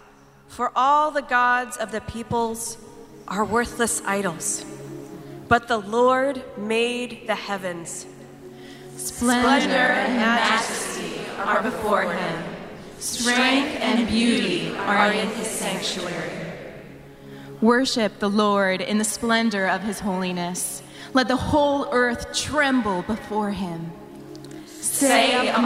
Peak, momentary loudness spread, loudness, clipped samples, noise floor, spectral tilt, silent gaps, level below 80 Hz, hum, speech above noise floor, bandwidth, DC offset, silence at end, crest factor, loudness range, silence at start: -2 dBFS; 19 LU; -22 LUFS; under 0.1%; -50 dBFS; -3.5 dB/octave; none; -50 dBFS; none; 28 dB; 16 kHz; under 0.1%; 0 s; 22 dB; 4 LU; 0.5 s